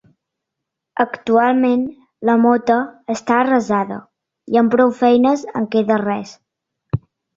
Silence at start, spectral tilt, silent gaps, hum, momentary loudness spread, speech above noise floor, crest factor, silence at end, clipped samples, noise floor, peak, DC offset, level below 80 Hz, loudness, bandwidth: 0.95 s; -6.5 dB/octave; none; none; 13 LU; 65 dB; 16 dB; 0.4 s; under 0.1%; -81 dBFS; -2 dBFS; under 0.1%; -52 dBFS; -17 LUFS; 7.6 kHz